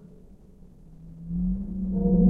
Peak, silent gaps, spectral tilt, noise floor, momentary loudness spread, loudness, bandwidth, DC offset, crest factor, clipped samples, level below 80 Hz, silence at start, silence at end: -10 dBFS; none; -14 dB/octave; -50 dBFS; 24 LU; -29 LUFS; 1.1 kHz; under 0.1%; 18 dB; under 0.1%; -36 dBFS; 0.9 s; 0 s